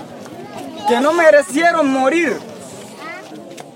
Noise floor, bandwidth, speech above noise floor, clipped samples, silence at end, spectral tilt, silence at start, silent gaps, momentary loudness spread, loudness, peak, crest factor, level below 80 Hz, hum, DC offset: -34 dBFS; 16.5 kHz; 21 dB; under 0.1%; 0.05 s; -3.5 dB/octave; 0 s; none; 22 LU; -14 LUFS; -2 dBFS; 16 dB; -66 dBFS; none; under 0.1%